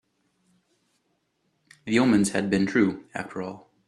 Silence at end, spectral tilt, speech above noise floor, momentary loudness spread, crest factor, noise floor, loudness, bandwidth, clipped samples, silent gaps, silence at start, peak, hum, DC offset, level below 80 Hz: 0.3 s; -5.5 dB/octave; 49 dB; 15 LU; 20 dB; -73 dBFS; -24 LUFS; 13 kHz; under 0.1%; none; 1.85 s; -8 dBFS; none; under 0.1%; -64 dBFS